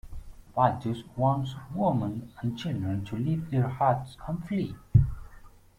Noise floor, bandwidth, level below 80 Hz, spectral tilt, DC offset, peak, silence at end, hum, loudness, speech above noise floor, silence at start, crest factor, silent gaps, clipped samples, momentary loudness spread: -51 dBFS; 10.5 kHz; -42 dBFS; -8.5 dB/octave; under 0.1%; -8 dBFS; 0.3 s; none; -29 LUFS; 22 dB; 0.05 s; 20 dB; none; under 0.1%; 11 LU